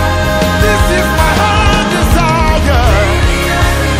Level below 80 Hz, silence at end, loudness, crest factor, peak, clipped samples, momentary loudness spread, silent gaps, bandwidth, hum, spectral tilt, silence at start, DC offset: -14 dBFS; 0 s; -10 LUFS; 10 dB; 0 dBFS; under 0.1%; 2 LU; none; 16 kHz; none; -5 dB/octave; 0 s; under 0.1%